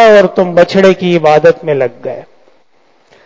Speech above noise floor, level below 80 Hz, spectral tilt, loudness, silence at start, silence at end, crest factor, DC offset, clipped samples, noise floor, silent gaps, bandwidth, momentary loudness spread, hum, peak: 43 dB; -50 dBFS; -6.5 dB/octave; -9 LUFS; 0 s; 1.05 s; 10 dB; under 0.1%; 2%; -52 dBFS; none; 8 kHz; 16 LU; none; 0 dBFS